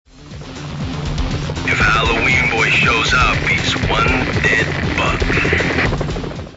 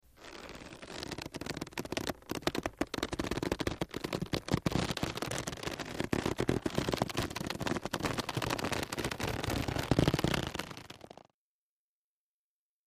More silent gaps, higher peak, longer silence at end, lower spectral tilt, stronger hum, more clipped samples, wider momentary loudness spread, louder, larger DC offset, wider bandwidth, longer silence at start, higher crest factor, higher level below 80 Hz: neither; first, -2 dBFS vs -12 dBFS; second, 0 s vs 1.8 s; about the same, -4.5 dB/octave vs -4.5 dB/octave; neither; neither; about the same, 12 LU vs 13 LU; first, -15 LUFS vs -35 LUFS; neither; second, 8 kHz vs 15.5 kHz; about the same, 0.15 s vs 0.2 s; second, 14 dB vs 24 dB; first, -26 dBFS vs -50 dBFS